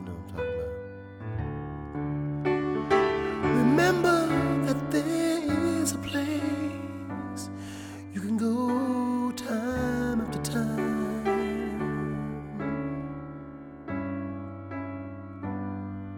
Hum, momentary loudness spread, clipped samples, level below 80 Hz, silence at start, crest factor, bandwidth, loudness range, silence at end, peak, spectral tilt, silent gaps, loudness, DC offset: none; 14 LU; under 0.1%; -50 dBFS; 0 s; 18 dB; 18.5 kHz; 9 LU; 0 s; -10 dBFS; -6 dB/octave; none; -29 LUFS; under 0.1%